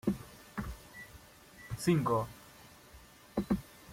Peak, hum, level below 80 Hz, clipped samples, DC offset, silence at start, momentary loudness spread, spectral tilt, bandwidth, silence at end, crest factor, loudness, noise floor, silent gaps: -18 dBFS; none; -54 dBFS; under 0.1%; under 0.1%; 0.05 s; 25 LU; -6.5 dB/octave; 16.5 kHz; 0 s; 20 dB; -36 LUFS; -57 dBFS; none